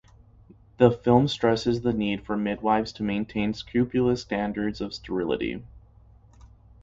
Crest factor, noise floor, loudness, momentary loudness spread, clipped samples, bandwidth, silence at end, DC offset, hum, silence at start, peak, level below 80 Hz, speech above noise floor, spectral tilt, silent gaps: 22 dB; -54 dBFS; -25 LUFS; 9 LU; under 0.1%; 7.8 kHz; 0.35 s; under 0.1%; none; 0.8 s; -4 dBFS; -50 dBFS; 29 dB; -7 dB/octave; none